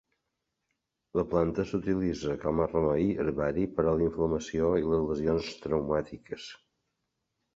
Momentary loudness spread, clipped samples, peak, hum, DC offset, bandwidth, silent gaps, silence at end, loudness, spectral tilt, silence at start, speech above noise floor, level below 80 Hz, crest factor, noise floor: 6 LU; under 0.1%; -12 dBFS; none; under 0.1%; 7.8 kHz; none; 1 s; -29 LUFS; -7.5 dB/octave; 1.15 s; 54 dB; -50 dBFS; 18 dB; -83 dBFS